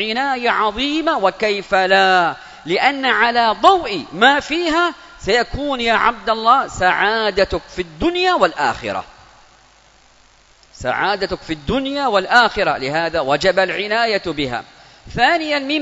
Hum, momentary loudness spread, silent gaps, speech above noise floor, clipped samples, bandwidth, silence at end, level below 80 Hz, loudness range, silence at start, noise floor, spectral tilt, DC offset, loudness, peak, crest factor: none; 10 LU; none; 34 dB; under 0.1%; 8 kHz; 0 s; -42 dBFS; 7 LU; 0 s; -51 dBFS; -4 dB/octave; under 0.1%; -16 LUFS; 0 dBFS; 18 dB